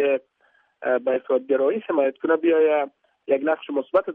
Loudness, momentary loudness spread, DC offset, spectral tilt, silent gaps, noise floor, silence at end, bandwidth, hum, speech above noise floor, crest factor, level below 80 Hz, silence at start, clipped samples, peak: -22 LUFS; 8 LU; under 0.1%; -8 dB/octave; none; -63 dBFS; 0 s; 3.8 kHz; none; 42 dB; 14 dB; -76 dBFS; 0 s; under 0.1%; -8 dBFS